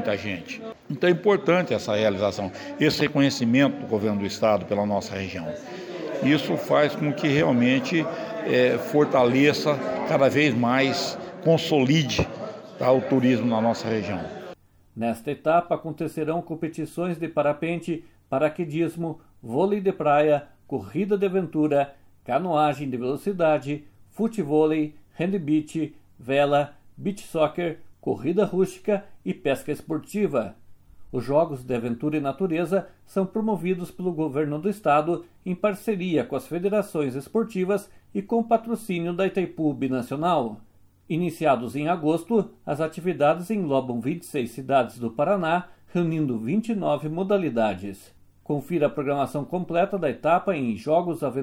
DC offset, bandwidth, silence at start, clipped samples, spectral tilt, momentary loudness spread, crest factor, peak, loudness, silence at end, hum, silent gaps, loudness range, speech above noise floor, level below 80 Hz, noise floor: under 0.1%; over 20 kHz; 0 s; under 0.1%; -6.5 dB/octave; 11 LU; 18 dB; -8 dBFS; -25 LUFS; 0 s; none; none; 5 LU; 22 dB; -58 dBFS; -46 dBFS